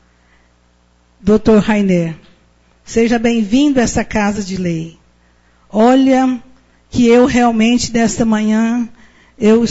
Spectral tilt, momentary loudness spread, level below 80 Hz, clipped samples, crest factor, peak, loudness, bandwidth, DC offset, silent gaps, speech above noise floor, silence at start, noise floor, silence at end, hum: -5.5 dB/octave; 12 LU; -38 dBFS; under 0.1%; 12 dB; -2 dBFS; -13 LUFS; 8 kHz; under 0.1%; none; 41 dB; 1.25 s; -53 dBFS; 0 s; 60 Hz at -40 dBFS